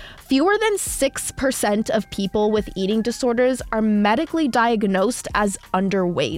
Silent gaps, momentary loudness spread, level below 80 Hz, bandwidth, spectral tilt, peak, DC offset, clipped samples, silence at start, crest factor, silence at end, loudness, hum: none; 4 LU; -44 dBFS; 16.5 kHz; -4.5 dB/octave; -6 dBFS; under 0.1%; under 0.1%; 0 s; 14 dB; 0 s; -20 LUFS; none